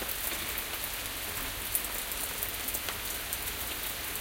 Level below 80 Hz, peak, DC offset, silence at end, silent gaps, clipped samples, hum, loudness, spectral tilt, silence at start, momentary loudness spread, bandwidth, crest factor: -50 dBFS; -10 dBFS; under 0.1%; 0 s; none; under 0.1%; none; -33 LUFS; -1 dB/octave; 0 s; 3 LU; 17 kHz; 26 dB